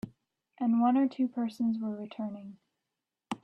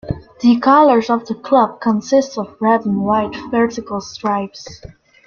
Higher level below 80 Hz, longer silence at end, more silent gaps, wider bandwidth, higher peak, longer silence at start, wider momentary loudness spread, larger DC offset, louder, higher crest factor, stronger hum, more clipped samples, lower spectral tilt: second, -76 dBFS vs -48 dBFS; second, 0.1 s vs 0.4 s; neither; first, 8.6 kHz vs 7 kHz; second, -16 dBFS vs -2 dBFS; about the same, 0.05 s vs 0.05 s; first, 19 LU vs 15 LU; neither; second, -31 LUFS vs -16 LUFS; about the same, 16 dB vs 14 dB; neither; neither; first, -7.5 dB/octave vs -6 dB/octave